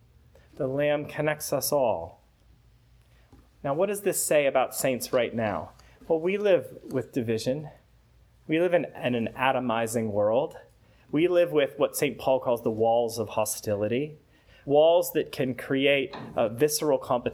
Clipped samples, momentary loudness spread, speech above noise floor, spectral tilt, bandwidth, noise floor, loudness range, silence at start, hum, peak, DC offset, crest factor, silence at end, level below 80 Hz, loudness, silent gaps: under 0.1%; 9 LU; 33 dB; -4.5 dB/octave; 18.5 kHz; -59 dBFS; 4 LU; 0.6 s; none; -8 dBFS; under 0.1%; 18 dB; 0 s; -60 dBFS; -26 LUFS; none